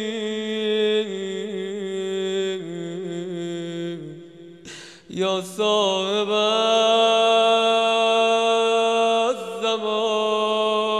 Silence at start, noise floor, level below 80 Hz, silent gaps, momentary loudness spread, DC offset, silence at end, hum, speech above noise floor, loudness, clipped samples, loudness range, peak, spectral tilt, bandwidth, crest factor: 0 s; -42 dBFS; -72 dBFS; none; 14 LU; under 0.1%; 0 s; none; 21 dB; -21 LUFS; under 0.1%; 11 LU; -6 dBFS; -3.5 dB/octave; 13 kHz; 14 dB